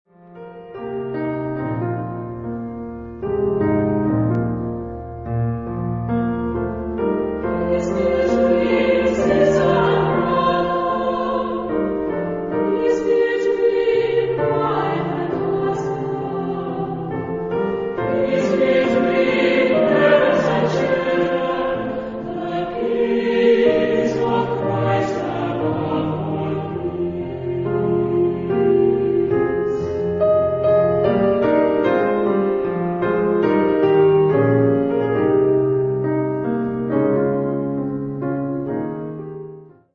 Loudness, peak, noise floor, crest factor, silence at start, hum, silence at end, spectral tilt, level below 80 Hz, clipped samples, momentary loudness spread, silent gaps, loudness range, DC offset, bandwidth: -19 LUFS; -2 dBFS; -39 dBFS; 16 dB; 0.3 s; none; 0.3 s; -8 dB/octave; -44 dBFS; under 0.1%; 9 LU; none; 6 LU; under 0.1%; 7.6 kHz